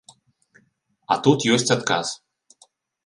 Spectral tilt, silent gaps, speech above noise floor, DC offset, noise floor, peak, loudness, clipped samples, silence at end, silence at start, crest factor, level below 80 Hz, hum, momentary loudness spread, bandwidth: -4 dB/octave; none; 45 dB; under 0.1%; -65 dBFS; -2 dBFS; -20 LUFS; under 0.1%; 0.9 s; 1.1 s; 22 dB; -66 dBFS; none; 11 LU; 11.5 kHz